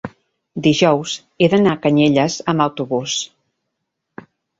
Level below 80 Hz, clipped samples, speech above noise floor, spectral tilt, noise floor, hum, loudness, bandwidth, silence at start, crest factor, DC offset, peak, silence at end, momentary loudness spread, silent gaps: -56 dBFS; under 0.1%; 60 dB; -5 dB/octave; -76 dBFS; none; -17 LUFS; 8 kHz; 0.05 s; 16 dB; under 0.1%; -2 dBFS; 1.35 s; 12 LU; none